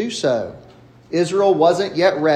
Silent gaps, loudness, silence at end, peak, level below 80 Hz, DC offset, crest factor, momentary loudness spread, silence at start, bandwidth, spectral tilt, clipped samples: none; -18 LUFS; 0 s; -2 dBFS; -58 dBFS; under 0.1%; 16 dB; 10 LU; 0 s; 10 kHz; -5 dB/octave; under 0.1%